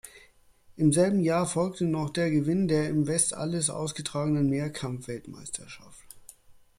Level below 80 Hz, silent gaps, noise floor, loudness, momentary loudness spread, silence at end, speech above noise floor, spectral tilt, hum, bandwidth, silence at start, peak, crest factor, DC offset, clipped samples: -60 dBFS; none; -58 dBFS; -27 LUFS; 15 LU; 0.25 s; 31 dB; -5.5 dB/octave; none; 15 kHz; 0.05 s; -8 dBFS; 20 dB; under 0.1%; under 0.1%